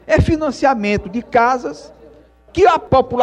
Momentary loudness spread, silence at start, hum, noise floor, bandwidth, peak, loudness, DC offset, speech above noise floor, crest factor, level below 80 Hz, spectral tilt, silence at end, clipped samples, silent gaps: 11 LU; 0.1 s; none; -45 dBFS; 10.5 kHz; -2 dBFS; -16 LUFS; under 0.1%; 30 dB; 14 dB; -34 dBFS; -6.5 dB/octave; 0 s; under 0.1%; none